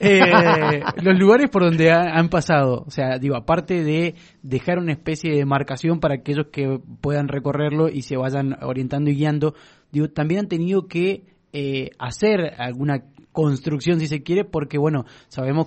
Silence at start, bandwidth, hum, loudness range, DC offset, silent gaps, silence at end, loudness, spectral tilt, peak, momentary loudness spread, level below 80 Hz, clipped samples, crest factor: 0 s; 8.8 kHz; none; 6 LU; under 0.1%; none; 0 s; -20 LUFS; -7 dB/octave; 0 dBFS; 11 LU; -50 dBFS; under 0.1%; 20 dB